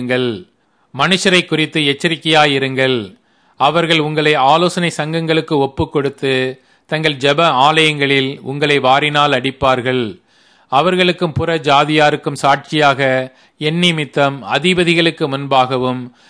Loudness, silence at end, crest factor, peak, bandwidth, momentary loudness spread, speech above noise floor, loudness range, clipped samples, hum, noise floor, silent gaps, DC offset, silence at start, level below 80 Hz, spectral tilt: -14 LUFS; 0.2 s; 14 dB; 0 dBFS; 11 kHz; 8 LU; 37 dB; 2 LU; under 0.1%; none; -51 dBFS; none; under 0.1%; 0 s; -48 dBFS; -5 dB/octave